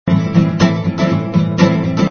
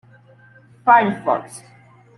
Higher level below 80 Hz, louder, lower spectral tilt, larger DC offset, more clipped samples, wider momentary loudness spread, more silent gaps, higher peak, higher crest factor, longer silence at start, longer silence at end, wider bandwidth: first, -44 dBFS vs -68 dBFS; first, -14 LUFS vs -17 LUFS; first, -7.5 dB/octave vs -5.5 dB/octave; neither; neither; second, 3 LU vs 24 LU; neither; about the same, 0 dBFS vs -2 dBFS; second, 14 dB vs 20 dB; second, 0.05 s vs 0.85 s; second, 0 s vs 0.6 s; second, 6.8 kHz vs 12 kHz